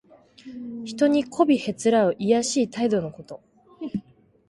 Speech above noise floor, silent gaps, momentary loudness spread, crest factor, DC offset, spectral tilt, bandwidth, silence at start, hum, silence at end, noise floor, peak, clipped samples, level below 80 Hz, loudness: 26 dB; none; 19 LU; 20 dB; under 0.1%; -5 dB/octave; 11.5 kHz; 0.45 s; none; 0.5 s; -48 dBFS; -6 dBFS; under 0.1%; -64 dBFS; -23 LUFS